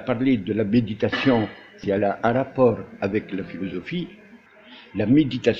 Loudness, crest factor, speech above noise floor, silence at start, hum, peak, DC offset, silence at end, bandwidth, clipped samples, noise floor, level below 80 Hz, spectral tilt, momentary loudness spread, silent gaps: -23 LUFS; 18 dB; 26 dB; 0 s; none; -4 dBFS; under 0.1%; 0 s; 7.2 kHz; under 0.1%; -48 dBFS; -52 dBFS; -8 dB/octave; 12 LU; none